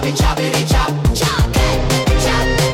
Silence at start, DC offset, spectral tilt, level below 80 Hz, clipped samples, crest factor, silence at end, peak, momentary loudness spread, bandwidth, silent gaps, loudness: 0 s; under 0.1%; -4.5 dB/octave; -20 dBFS; under 0.1%; 10 dB; 0 s; -4 dBFS; 1 LU; 17.5 kHz; none; -15 LUFS